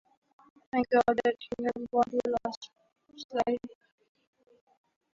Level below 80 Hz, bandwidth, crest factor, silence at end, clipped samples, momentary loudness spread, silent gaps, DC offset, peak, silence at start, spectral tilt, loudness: -66 dBFS; 7.6 kHz; 20 dB; 1.45 s; under 0.1%; 19 LU; 2.57-2.61 s, 3.24-3.29 s; under 0.1%; -12 dBFS; 0.75 s; -5.5 dB/octave; -30 LUFS